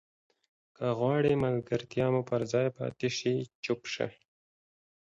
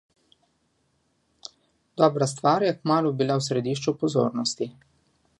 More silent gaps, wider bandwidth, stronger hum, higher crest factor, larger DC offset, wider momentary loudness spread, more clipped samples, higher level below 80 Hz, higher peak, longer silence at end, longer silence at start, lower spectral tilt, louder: first, 3.55-3.63 s vs none; second, 7.8 kHz vs 11.5 kHz; neither; about the same, 18 dB vs 22 dB; neither; second, 8 LU vs 21 LU; neither; about the same, -64 dBFS vs -68 dBFS; second, -14 dBFS vs -6 dBFS; first, 0.95 s vs 0.7 s; second, 0.8 s vs 1.95 s; about the same, -6 dB/octave vs -5.5 dB/octave; second, -31 LUFS vs -24 LUFS